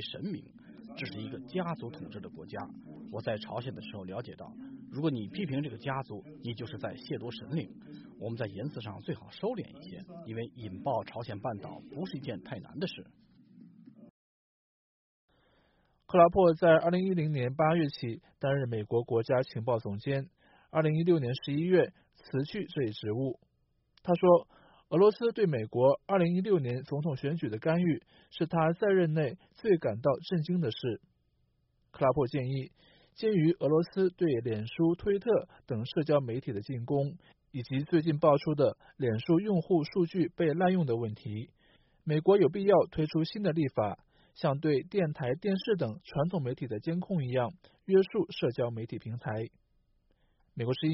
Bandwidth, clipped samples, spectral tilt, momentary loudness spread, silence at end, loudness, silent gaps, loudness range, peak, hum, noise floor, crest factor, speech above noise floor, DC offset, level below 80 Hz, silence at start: 5.8 kHz; under 0.1%; -6.5 dB/octave; 17 LU; 0 s; -31 LUFS; 14.10-15.28 s; 11 LU; -10 dBFS; none; -74 dBFS; 22 dB; 44 dB; under 0.1%; -64 dBFS; 0 s